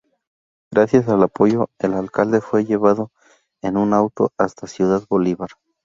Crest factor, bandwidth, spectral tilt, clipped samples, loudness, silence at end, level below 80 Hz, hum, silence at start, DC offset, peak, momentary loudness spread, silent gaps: 18 dB; 7.6 kHz; -8 dB/octave; under 0.1%; -19 LUFS; 0.4 s; -56 dBFS; none; 0.7 s; under 0.1%; -2 dBFS; 8 LU; none